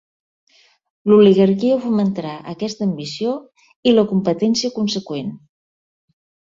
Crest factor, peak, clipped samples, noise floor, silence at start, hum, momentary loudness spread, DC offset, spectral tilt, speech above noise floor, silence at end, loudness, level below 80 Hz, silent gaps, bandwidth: 16 dB; -2 dBFS; under 0.1%; under -90 dBFS; 1.05 s; none; 15 LU; under 0.1%; -6.5 dB/octave; over 73 dB; 1.15 s; -17 LUFS; -60 dBFS; 3.76-3.83 s; 7.6 kHz